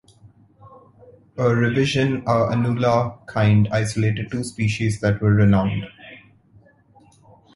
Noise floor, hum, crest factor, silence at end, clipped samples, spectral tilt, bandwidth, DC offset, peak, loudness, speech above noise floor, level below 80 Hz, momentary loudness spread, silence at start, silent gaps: -54 dBFS; none; 16 dB; 1.4 s; under 0.1%; -7 dB/octave; 11.5 kHz; under 0.1%; -4 dBFS; -20 LUFS; 35 dB; -46 dBFS; 9 LU; 0.25 s; none